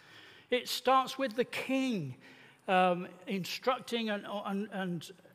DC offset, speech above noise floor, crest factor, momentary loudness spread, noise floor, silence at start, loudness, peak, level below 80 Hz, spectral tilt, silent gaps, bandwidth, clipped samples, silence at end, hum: under 0.1%; 23 dB; 20 dB; 12 LU; -56 dBFS; 0.1 s; -33 LUFS; -14 dBFS; -78 dBFS; -4.5 dB/octave; none; 15.5 kHz; under 0.1%; 0.2 s; none